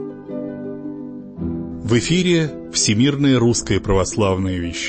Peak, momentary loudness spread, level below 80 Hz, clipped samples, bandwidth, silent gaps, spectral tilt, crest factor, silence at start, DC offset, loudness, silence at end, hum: -4 dBFS; 14 LU; -38 dBFS; under 0.1%; 8.8 kHz; none; -4.5 dB/octave; 14 dB; 0 s; under 0.1%; -18 LUFS; 0 s; none